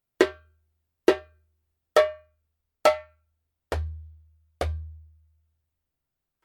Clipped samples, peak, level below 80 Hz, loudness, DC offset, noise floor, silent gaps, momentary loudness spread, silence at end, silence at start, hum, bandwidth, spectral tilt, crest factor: under 0.1%; -4 dBFS; -44 dBFS; -27 LUFS; under 0.1%; -85 dBFS; none; 15 LU; 1.45 s; 0.2 s; none; 17.5 kHz; -5 dB/octave; 26 dB